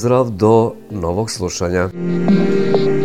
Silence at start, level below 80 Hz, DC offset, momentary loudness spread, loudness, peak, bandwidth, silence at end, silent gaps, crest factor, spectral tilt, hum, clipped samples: 0 s; -42 dBFS; under 0.1%; 8 LU; -16 LUFS; 0 dBFS; 14.5 kHz; 0 s; none; 16 dB; -6.5 dB/octave; none; under 0.1%